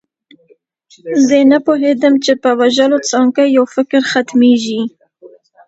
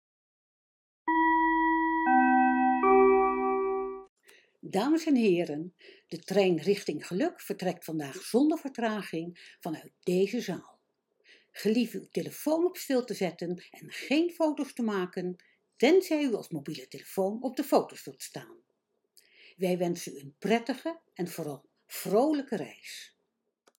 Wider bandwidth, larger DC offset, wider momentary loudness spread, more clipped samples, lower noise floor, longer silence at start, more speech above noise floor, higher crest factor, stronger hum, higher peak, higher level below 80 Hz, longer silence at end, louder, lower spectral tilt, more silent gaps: second, 8 kHz vs 18 kHz; neither; second, 9 LU vs 18 LU; neither; second, -52 dBFS vs -80 dBFS; about the same, 1.05 s vs 1.05 s; second, 41 dB vs 50 dB; second, 12 dB vs 20 dB; neither; first, 0 dBFS vs -10 dBFS; about the same, -64 dBFS vs -66 dBFS; second, 0.4 s vs 0.75 s; first, -12 LUFS vs -29 LUFS; second, -3.5 dB/octave vs -5.5 dB/octave; second, none vs 4.09-4.16 s